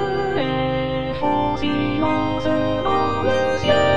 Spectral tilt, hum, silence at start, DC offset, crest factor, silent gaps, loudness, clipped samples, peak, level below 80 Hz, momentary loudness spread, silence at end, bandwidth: -6.5 dB/octave; none; 0 s; 2%; 14 dB; none; -20 LUFS; under 0.1%; -4 dBFS; -40 dBFS; 3 LU; 0 s; 10 kHz